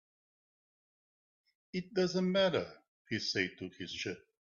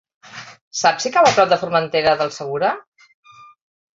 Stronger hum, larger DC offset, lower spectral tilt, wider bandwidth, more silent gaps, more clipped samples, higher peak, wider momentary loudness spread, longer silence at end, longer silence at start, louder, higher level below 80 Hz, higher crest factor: neither; neither; first, -5 dB/octave vs -3 dB/octave; about the same, 7.4 kHz vs 8 kHz; first, 2.88-3.05 s vs 0.61-0.71 s; neither; second, -16 dBFS vs -2 dBFS; second, 13 LU vs 23 LU; second, 0.25 s vs 1.15 s; first, 1.75 s vs 0.35 s; second, -35 LUFS vs -17 LUFS; second, -74 dBFS vs -60 dBFS; about the same, 20 dB vs 18 dB